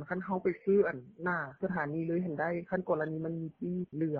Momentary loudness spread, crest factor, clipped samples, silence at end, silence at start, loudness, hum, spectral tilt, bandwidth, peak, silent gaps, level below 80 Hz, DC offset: 9 LU; 16 dB; under 0.1%; 0 s; 0 s; -34 LUFS; none; -8.5 dB/octave; 4.6 kHz; -16 dBFS; none; -68 dBFS; under 0.1%